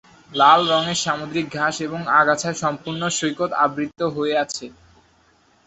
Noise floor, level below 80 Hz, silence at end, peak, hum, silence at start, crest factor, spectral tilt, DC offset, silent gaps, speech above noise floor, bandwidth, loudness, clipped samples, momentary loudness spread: -58 dBFS; -60 dBFS; 0.95 s; -2 dBFS; none; 0.3 s; 20 dB; -3.5 dB/octave; under 0.1%; none; 38 dB; 8.4 kHz; -20 LUFS; under 0.1%; 11 LU